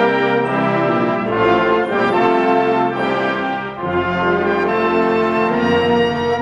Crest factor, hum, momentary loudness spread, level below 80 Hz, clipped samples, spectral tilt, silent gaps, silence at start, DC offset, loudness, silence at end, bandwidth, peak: 14 dB; none; 4 LU; -48 dBFS; under 0.1%; -7 dB/octave; none; 0 s; under 0.1%; -16 LUFS; 0 s; 10 kHz; -2 dBFS